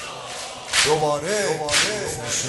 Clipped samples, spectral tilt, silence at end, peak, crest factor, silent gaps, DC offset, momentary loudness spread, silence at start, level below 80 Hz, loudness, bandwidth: under 0.1%; -1.5 dB/octave; 0 s; -4 dBFS; 20 dB; none; under 0.1%; 13 LU; 0 s; -52 dBFS; -20 LUFS; 12 kHz